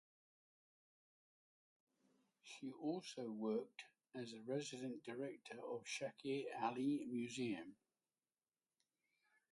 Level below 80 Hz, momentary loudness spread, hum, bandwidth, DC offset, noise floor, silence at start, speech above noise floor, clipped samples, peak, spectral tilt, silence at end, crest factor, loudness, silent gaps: under -90 dBFS; 13 LU; none; 11.5 kHz; under 0.1%; under -90 dBFS; 2.45 s; over 44 dB; under 0.1%; -28 dBFS; -5 dB/octave; 1.8 s; 22 dB; -47 LUFS; none